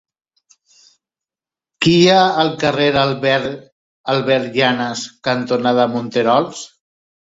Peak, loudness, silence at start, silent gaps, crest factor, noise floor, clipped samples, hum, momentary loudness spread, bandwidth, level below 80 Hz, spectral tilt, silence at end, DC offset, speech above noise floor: 0 dBFS; -16 LUFS; 1.8 s; 3.72-4.04 s; 16 dB; -90 dBFS; under 0.1%; none; 14 LU; 8 kHz; -54 dBFS; -5 dB/octave; 0.7 s; under 0.1%; 74 dB